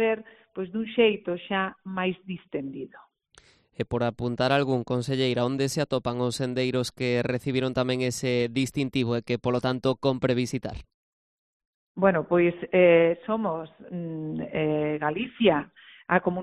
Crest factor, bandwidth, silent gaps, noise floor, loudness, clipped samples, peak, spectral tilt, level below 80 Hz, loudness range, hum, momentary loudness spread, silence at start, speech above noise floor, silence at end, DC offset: 22 dB; 12.5 kHz; 10.94-11.60 s, 11.67-11.95 s; -59 dBFS; -26 LUFS; under 0.1%; -4 dBFS; -6 dB/octave; -56 dBFS; 5 LU; none; 12 LU; 0 s; 33 dB; 0 s; under 0.1%